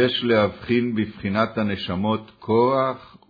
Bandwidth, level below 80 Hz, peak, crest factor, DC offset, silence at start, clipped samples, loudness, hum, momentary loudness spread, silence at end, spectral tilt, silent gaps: 5 kHz; -54 dBFS; -6 dBFS; 16 dB; under 0.1%; 0 s; under 0.1%; -22 LUFS; none; 7 LU; 0.25 s; -8.5 dB/octave; none